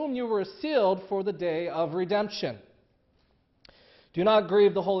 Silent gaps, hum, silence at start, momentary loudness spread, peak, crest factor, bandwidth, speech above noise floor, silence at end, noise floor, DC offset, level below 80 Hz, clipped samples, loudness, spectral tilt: none; none; 0 s; 11 LU; -10 dBFS; 16 dB; 6 kHz; 41 dB; 0 s; -67 dBFS; under 0.1%; -68 dBFS; under 0.1%; -27 LUFS; -7 dB/octave